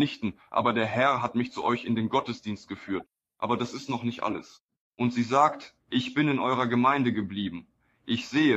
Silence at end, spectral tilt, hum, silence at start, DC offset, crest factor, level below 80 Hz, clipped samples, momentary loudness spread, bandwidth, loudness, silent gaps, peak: 0 s; -6 dB/octave; none; 0 s; under 0.1%; 20 dB; -66 dBFS; under 0.1%; 12 LU; 8.2 kHz; -28 LUFS; 4.60-4.69 s, 4.77-4.91 s; -8 dBFS